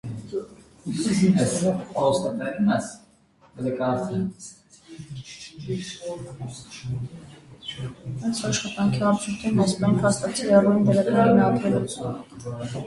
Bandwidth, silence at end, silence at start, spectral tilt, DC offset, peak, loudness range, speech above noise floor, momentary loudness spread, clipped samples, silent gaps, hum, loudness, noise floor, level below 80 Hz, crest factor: 11.5 kHz; 0 s; 0.05 s; -6 dB/octave; under 0.1%; -4 dBFS; 14 LU; 34 dB; 19 LU; under 0.1%; none; none; -23 LUFS; -57 dBFS; -54 dBFS; 20 dB